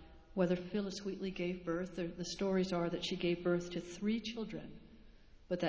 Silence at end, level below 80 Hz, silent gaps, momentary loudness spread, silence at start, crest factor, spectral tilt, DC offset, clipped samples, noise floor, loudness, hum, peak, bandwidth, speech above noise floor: 0 s; -62 dBFS; none; 9 LU; 0 s; 18 dB; -6 dB/octave; under 0.1%; under 0.1%; -59 dBFS; -38 LUFS; none; -20 dBFS; 8 kHz; 21 dB